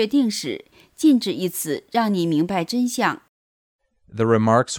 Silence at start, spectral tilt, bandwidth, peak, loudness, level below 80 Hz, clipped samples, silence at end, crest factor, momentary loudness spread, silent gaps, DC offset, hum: 0 s; -5 dB/octave; 19.5 kHz; -4 dBFS; -21 LUFS; -64 dBFS; under 0.1%; 0 s; 18 dB; 11 LU; 3.29-3.79 s; under 0.1%; none